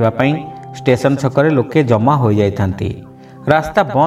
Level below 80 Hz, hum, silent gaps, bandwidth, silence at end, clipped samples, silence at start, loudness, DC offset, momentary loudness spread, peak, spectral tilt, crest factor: -44 dBFS; none; none; 13.5 kHz; 0 s; under 0.1%; 0 s; -15 LUFS; under 0.1%; 11 LU; 0 dBFS; -7.5 dB/octave; 14 dB